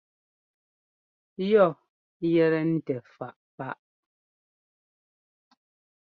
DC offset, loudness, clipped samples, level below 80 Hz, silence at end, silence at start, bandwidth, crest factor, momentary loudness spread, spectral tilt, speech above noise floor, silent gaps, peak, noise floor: under 0.1%; -25 LUFS; under 0.1%; -74 dBFS; 2.3 s; 1.4 s; 4.9 kHz; 22 dB; 21 LU; -10 dB/octave; over 66 dB; 1.89-2.20 s, 3.36-3.58 s; -8 dBFS; under -90 dBFS